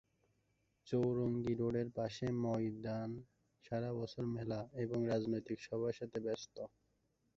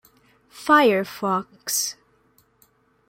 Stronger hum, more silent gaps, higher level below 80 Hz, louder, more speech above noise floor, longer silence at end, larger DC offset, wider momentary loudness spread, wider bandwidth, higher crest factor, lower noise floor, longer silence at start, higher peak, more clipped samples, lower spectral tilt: neither; neither; about the same, -68 dBFS vs -70 dBFS; second, -40 LUFS vs -21 LUFS; about the same, 41 dB vs 41 dB; second, 0.7 s vs 1.15 s; neither; second, 8 LU vs 11 LU; second, 7.6 kHz vs 16.5 kHz; about the same, 16 dB vs 20 dB; first, -80 dBFS vs -62 dBFS; first, 0.85 s vs 0.55 s; second, -24 dBFS vs -4 dBFS; neither; first, -7.5 dB/octave vs -3 dB/octave